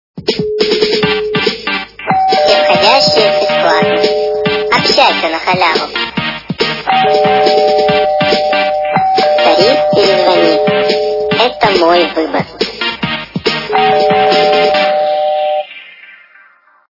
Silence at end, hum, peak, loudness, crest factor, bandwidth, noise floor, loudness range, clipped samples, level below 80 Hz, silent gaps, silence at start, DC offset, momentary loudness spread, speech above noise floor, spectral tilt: 1.05 s; none; 0 dBFS; -11 LUFS; 12 dB; 6 kHz; -46 dBFS; 2 LU; 0.2%; -46 dBFS; none; 0.15 s; under 0.1%; 8 LU; 35 dB; -4.5 dB/octave